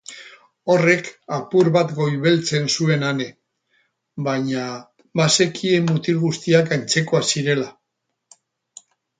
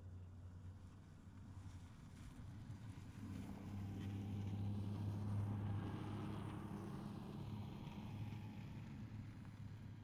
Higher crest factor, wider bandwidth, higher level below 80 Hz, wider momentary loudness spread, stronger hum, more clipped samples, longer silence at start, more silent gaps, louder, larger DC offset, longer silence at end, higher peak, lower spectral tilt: first, 20 dB vs 14 dB; second, 9.6 kHz vs 13 kHz; about the same, -64 dBFS vs -64 dBFS; about the same, 14 LU vs 13 LU; neither; neither; about the same, 0.1 s vs 0 s; neither; first, -19 LUFS vs -50 LUFS; neither; first, 1.5 s vs 0 s; first, -2 dBFS vs -34 dBFS; second, -4.5 dB/octave vs -8 dB/octave